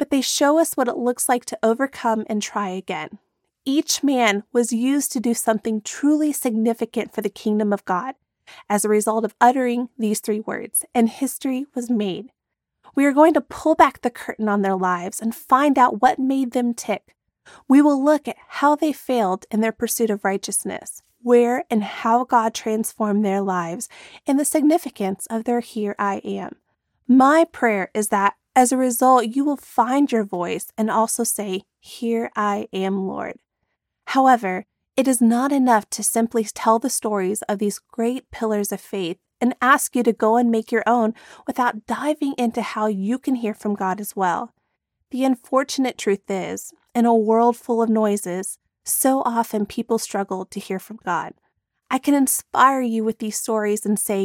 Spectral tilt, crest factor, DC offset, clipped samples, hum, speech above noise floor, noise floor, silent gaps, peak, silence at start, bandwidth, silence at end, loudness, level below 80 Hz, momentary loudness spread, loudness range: -4 dB/octave; 18 dB; under 0.1%; under 0.1%; none; 56 dB; -76 dBFS; none; -2 dBFS; 0 s; 17.5 kHz; 0 s; -21 LUFS; -64 dBFS; 11 LU; 4 LU